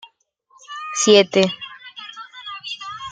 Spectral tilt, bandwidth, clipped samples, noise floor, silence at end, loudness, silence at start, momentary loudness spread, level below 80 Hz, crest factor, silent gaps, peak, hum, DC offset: -3 dB/octave; 9.4 kHz; under 0.1%; -59 dBFS; 0 s; -17 LUFS; 0.7 s; 22 LU; -66 dBFS; 20 dB; none; -2 dBFS; none; under 0.1%